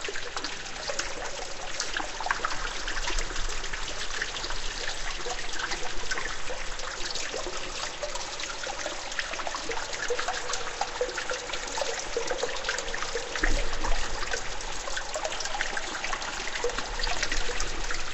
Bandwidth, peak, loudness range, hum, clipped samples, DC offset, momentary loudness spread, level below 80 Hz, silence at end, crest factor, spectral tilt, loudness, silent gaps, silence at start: 8.4 kHz; -10 dBFS; 2 LU; none; under 0.1%; under 0.1%; 4 LU; -36 dBFS; 0 s; 20 dB; -1 dB/octave; -32 LUFS; none; 0 s